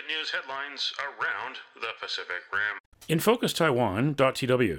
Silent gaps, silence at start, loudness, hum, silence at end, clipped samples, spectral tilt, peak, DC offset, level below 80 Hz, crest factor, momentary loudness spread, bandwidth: 2.80-2.92 s; 0 s; -28 LUFS; none; 0 s; under 0.1%; -4.5 dB/octave; -10 dBFS; under 0.1%; -62 dBFS; 18 dB; 11 LU; 17.5 kHz